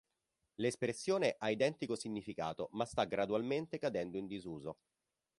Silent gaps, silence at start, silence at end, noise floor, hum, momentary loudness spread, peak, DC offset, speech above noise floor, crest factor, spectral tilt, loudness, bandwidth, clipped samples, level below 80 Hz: none; 0.6 s; 0.65 s; -86 dBFS; none; 11 LU; -18 dBFS; under 0.1%; 48 dB; 20 dB; -5 dB/octave; -38 LUFS; 11.5 kHz; under 0.1%; -70 dBFS